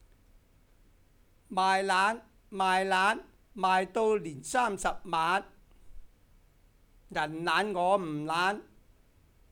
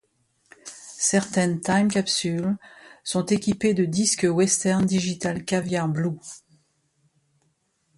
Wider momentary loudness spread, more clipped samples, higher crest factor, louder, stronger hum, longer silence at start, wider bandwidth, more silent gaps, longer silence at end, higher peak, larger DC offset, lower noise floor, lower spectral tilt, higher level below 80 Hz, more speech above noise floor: second, 10 LU vs 16 LU; neither; about the same, 20 dB vs 18 dB; second, -29 LUFS vs -23 LUFS; neither; first, 1.5 s vs 0.65 s; first, 18 kHz vs 11.5 kHz; neither; second, 0.9 s vs 1.6 s; second, -12 dBFS vs -6 dBFS; neither; second, -62 dBFS vs -70 dBFS; about the same, -3.5 dB/octave vs -4.5 dB/octave; about the same, -58 dBFS vs -60 dBFS; second, 34 dB vs 47 dB